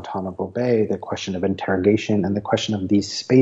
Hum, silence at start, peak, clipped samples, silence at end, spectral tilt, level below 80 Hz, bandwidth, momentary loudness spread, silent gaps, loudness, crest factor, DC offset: none; 0 s; -4 dBFS; under 0.1%; 0 s; -6 dB/octave; -56 dBFS; 8 kHz; 8 LU; none; -22 LUFS; 16 dB; under 0.1%